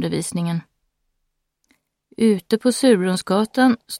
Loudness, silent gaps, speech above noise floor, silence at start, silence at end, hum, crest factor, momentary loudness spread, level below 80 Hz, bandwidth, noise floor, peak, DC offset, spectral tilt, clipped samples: -19 LUFS; none; 55 dB; 0 s; 0 s; none; 18 dB; 8 LU; -62 dBFS; 16 kHz; -74 dBFS; -4 dBFS; under 0.1%; -5.5 dB/octave; under 0.1%